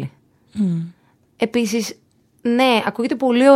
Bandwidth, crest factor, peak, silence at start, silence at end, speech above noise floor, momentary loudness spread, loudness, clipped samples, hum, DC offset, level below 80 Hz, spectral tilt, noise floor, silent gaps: 15.5 kHz; 18 dB; 0 dBFS; 0 s; 0 s; 28 dB; 15 LU; -20 LUFS; under 0.1%; none; under 0.1%; -64 dBFS; -5.5 dB/octave; -44 dBFS; none